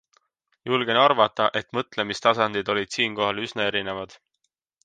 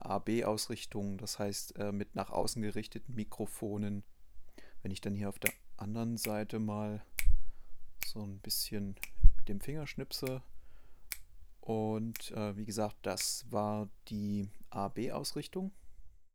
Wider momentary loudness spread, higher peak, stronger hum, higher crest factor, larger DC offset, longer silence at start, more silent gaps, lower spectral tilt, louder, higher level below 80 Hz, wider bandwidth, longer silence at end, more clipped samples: about the same, 11 LU vs 9 LU; about the same, -4 dBFS vs -6 dBFS; neither; about the same, 22 dB vs 26 dB; neither; first, 0.65 s vs 0 s; neither; about the same, -4 dB/octave vs -4.5 dB/octave; first, -23 LUFS vs -38 LUFS; second, -64 dBFS vs -40 dBFS; second, 9.6 kHz vs over 20 kHz; first, 0.7 s vs 0.1 s; neither